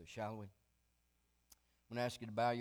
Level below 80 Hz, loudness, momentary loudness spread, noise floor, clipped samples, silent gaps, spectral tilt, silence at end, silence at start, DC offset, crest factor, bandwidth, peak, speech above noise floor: -76 dBFS; -43 LUFS; 14 LU; -80 dBFS; under 0.1%; none; -5.5 dB/octave; 0 s; 0 s; under 0.1%; 18 dB; over 20 kHz; -26 dBFS; 38 dB